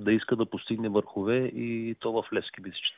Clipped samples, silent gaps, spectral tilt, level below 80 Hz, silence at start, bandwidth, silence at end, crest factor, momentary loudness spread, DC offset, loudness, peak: under 0.1%; none; -4 dB/octave; -64 dBFS; 0 s; 4 kHz; 0.05 s; 18 dB; 6 LU; under 0.1%; -30 LUFS; -12 dBFS